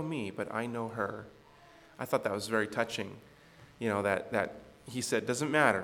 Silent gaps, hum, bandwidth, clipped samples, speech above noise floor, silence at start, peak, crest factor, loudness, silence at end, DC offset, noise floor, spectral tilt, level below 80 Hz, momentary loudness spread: none; none; 18 kHz; under 0.1%; 25 dB; 0 s; -10 dBFS; 24 dB; -33 LUFS; 0 s; under 0.1%; -58 dBFS; -4.5 dB/octave; -70 dBFS; 13 LU